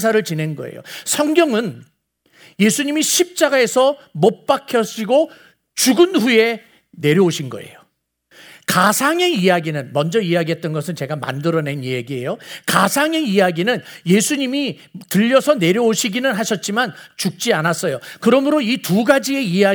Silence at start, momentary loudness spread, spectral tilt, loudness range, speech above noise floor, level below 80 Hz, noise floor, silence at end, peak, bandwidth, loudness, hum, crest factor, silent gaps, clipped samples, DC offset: 0 s; 10 LU; -4 dB/octave; 2 LU; 45 dB; -68 dBFS; -61 dBFS; 0 s; 0 dBFS; over 20 kHz; -17 LUFS; none; 18 dB; none; under 0.1%; under 0.1%